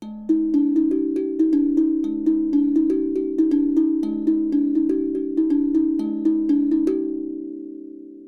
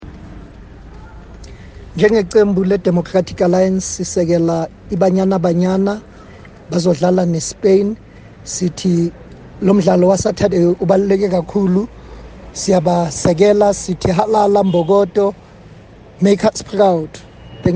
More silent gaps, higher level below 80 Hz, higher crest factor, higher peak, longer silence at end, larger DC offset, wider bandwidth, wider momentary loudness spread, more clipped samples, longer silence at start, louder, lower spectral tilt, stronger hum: neither; second, -52 dBFS vs -40 dBFS; about the same, 12 dB vs 14 dB; second, -8 dBFS vs 0 dBFS; about the same, 0 s vs 0 s; neither; second, 3.8 kHz vs 9.8 kHz; about the same, 8 LU vs 9 LU; neither; about the same, 0 s vs 0 s; second, -21 LUFS vs -15 LUFS; first, -9 dB/octave vs -6.5 dB/octave; neither